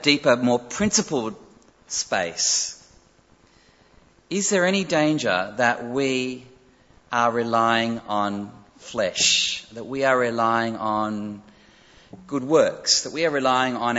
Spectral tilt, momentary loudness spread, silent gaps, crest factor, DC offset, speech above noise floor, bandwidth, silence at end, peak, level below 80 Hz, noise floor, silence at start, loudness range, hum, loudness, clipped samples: -2.5 dB/octave; 12 LU; none; 20 dB; under 0.1%; 35 dB; 8.2 kHz; 0 s; -4 dBFS; -60 dBFS; -57 dBFS; 0 s; 3 LU; none; -22 LUFS; under 0.1%